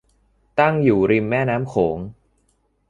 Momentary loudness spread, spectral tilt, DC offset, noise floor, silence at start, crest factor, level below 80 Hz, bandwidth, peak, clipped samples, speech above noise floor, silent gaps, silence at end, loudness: 11 LU; -8.5 dB/octave; under 0.1%; -65 dBFS; 0.55 s; 18 dB; -50 dBFS; 10 kHz; -2 dBFS; under 0.1%; 47 dB; none; 0.75 s; -19 LUFS